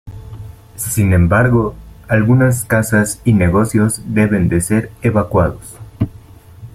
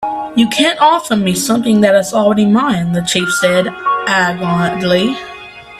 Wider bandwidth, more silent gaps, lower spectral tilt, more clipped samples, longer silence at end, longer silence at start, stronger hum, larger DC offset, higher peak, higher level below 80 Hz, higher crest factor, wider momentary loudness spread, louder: about the same, 15.5 kHz vs 15 kHz; neither; first, -7 dB/octave vs -4.5 dB/octave; neither; about the same, 0.05 s vs 0 s; about the same, 0.05 s vs 0 s; neither; neither; about the same, -2 dBFS vs 0 dBFS; first, -36 dBFS vs -48 dBFS; about the same, 14 dB vs 12 dB; first, 21 LU vs 6 LU; about the same, -15 LUFS vs -13 LUFS